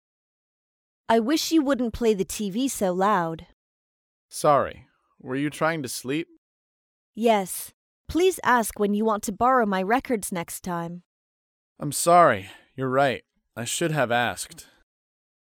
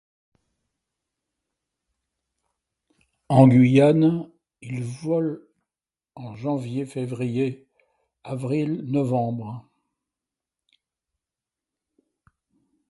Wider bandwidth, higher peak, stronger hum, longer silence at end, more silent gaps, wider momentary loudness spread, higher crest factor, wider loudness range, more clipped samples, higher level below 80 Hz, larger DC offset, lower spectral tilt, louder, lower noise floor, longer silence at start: first, 19 kHz vs 11.5 kHz; second, -4 dBFS vs 0 dBFS; neither; second, 0.9 s vs 3.3 s; first, 3.53-4.29 s, 6.38-7.13 s, 7.74-8.04 s, 11.05-11.76 s vs none; second, 14 LU vs 23 LU; about the same, 20 dB vs 24 dB; second, 4 LU vs 10 LU; neither; first, -54 dBFS vs -64 dBFS; neither; second, -4.5 dB/octave vs -8.5 dB/octave; about the same, -24 LUFS vs -22 LUFS; about the same, under -90 dBFS vs under -90 dBFS; second, 1.1 s vs 3.3 s